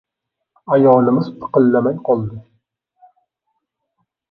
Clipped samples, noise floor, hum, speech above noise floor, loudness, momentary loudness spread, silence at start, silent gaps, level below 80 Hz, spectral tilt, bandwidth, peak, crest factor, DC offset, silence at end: under 0.1%; -79 dBFS; none; 65 dB; -15 LUFS; 8 LU; 0.7 s; none; -58 dBFS; -11 dB/octave; 5 kHz; 0 dBFS; 18 dB; under 0.1%; 1.9 s